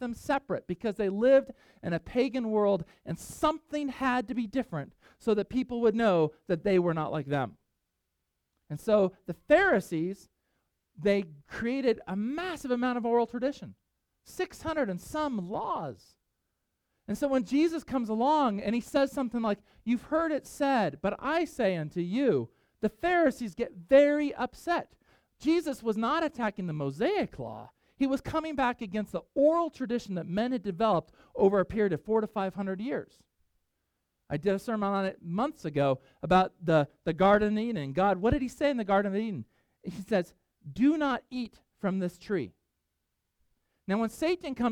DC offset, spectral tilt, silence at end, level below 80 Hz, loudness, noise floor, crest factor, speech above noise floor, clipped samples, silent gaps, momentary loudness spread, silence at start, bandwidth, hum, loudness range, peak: under 0.1%; -6.5 dB/octave; 0 s; -56 dBFS; -29 LUFS; -82 dBFS; 20 dB; 53 dB; under 0.1%; none; 11 LU; 0 s; 16.5 kHz; none; 5 LU; -10 dBFS